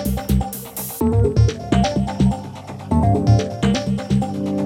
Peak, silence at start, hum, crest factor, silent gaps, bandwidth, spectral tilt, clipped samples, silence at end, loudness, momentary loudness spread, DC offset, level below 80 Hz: -4 dBFS; 0 s; none; 14 dB; none; 17 kHz; -7 dB/octave; under 0.1%; 0 s; -19 LUFS; 11 LU; under 0.1%; -28 dBFS